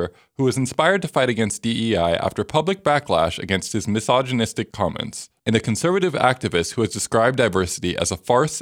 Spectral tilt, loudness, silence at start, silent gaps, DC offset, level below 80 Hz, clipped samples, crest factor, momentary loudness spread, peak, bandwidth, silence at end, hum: -4.5 dB/octave; -21 LUFS; 0 s; none; under 0.1%; -48 dBFS; under 0.1%; 20 dB; 6 LU; 0 dBFS; 16.5 kHz; 0 s; none